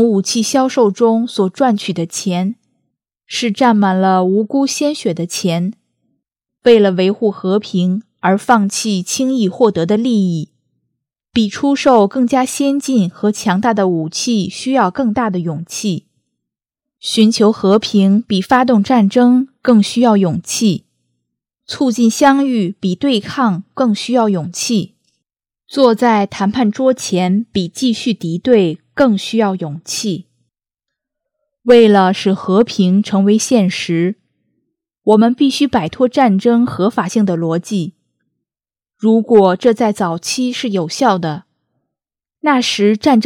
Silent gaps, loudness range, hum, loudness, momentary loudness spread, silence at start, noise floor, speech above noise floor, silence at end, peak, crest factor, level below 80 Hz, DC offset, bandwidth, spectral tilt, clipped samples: none; 4 LU; none; -14 LUFS; 9 LU; 0 s; under -90 dBFS; over 77 dB; 0 s; 0 dBFS; 14 dB; -56 dBFS; under 0.1%; 16.5 kHz; -5.5 dB/octave; under 0.1%